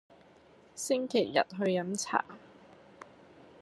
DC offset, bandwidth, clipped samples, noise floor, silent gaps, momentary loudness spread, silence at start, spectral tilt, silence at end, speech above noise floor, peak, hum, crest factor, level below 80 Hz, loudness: under 0.1%; 13 kHz; under 0.1%; -59 dBFS; none; 24 LU; 0.75 s; -4 dB/octave; 0.6 s; 28 dB; -10 dBFS; none; 24 dB; -78 dBFS; -31 LUFS